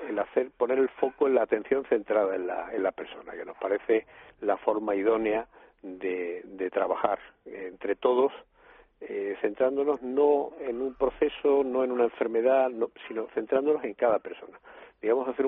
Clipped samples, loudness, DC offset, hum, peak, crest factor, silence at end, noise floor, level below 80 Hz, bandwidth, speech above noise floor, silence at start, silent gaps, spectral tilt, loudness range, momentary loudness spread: under 0.1%; -28 LUFS; under 0.1%; none; -10 dBFS; 18 dB; 0 s; -57 dBFS; -64 dBFS; 3.9 kHz; 30 dB; 0 s; none; -3.5 dB/octave; 4 LU; 13 LU